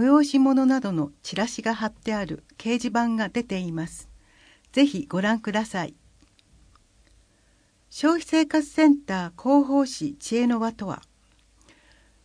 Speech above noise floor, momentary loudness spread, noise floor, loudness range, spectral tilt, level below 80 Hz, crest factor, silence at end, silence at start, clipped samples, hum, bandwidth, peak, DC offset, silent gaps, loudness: 39 dB; 13 LU; -62 dBFS; 5 LU; -5 dB/octave; -58 dBFS; 18 dB; 1.25 s; 0 s; under 0.1%; none; 10.5 kHz; -6 dBFS; under 0.1%; none; -24 LUFS